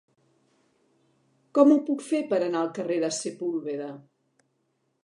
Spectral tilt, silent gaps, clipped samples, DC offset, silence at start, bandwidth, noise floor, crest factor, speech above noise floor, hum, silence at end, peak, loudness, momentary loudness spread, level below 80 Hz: -5 dB/octave; none; under 0.1%; under 0.1%; 1.55 s; 11.5 kHz; -74 dBFS; 22 dB; 49 dB; none; 1.05 s; -6 dBFS; -26 LUFS; 15 LU; -86 dBFS